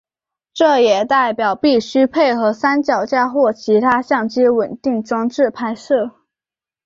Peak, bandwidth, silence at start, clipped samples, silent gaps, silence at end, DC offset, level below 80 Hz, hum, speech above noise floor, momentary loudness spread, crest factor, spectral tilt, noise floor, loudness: -2 dBFS; 7.6 kHz; 0.55 s; under 0.1%; none; 0.75 s; under 0.1%; -60 dBFS; none; over 75 dB; 6 LU; 14 dB; -5 dB/octave; under -90 dBFS; -16 LUFS